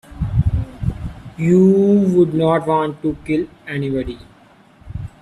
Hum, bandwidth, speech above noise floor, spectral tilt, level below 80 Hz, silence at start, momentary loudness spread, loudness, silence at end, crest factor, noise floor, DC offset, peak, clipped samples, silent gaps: none; 11 kHz; 33 dB; -9 dB/octave; -32 dBFS; 0.1 s; 19 LU; -17 LUFS; 0.15 s; 14 dB; -48 dBFS; under 0.1%; -2 dBFS; under 0.1%; none